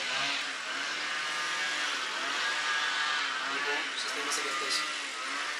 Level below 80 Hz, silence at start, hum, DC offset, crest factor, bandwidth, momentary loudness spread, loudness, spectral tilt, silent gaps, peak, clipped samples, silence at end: under -90 dBFS; 0 s; none; under 0.1%; 16 dB; 16 kHz; 4 LU; -30 LUFS; 1 dB/octave; none; -18 dBFS; under 0.1%; 0 s